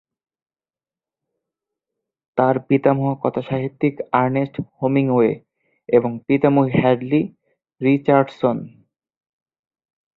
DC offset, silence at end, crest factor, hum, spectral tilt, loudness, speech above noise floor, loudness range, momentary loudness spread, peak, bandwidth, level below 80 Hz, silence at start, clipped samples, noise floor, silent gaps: under 0.1%; 1.5 s; 18 dB; none; -10.5 dB/octave; -19 LUFS; over 72 dB; 4 LU; 8 LU; -2 dBFS; 4.6 kHz; -58 dBFS; 2.35 s; under 0.1%; under -90 dBFS; none